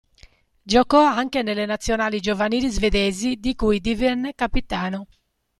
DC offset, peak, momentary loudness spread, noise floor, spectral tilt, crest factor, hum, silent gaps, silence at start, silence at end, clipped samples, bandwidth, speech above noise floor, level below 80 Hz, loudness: under 0.1%; -2 dBFS; 9 LU; -53 dBFS; -4.5 dB/octave; 18 dB; none; none; 0.65 s; 0.55 s; under 0.1%; 13 kHz; 32 dB; -34 dBFS; -21 LUFS